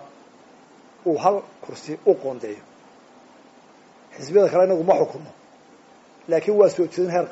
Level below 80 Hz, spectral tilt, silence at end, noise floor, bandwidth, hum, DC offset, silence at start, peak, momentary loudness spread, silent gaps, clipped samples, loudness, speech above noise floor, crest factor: -72 dBFS; -6 dB/octave; 0 s; -51 dBFS; 8 kHz; none; under 0.1%; 0 s; -4 dBFS; 21 LU; none; under 0.1%; -21 LUFS; 30 dB; 18 dB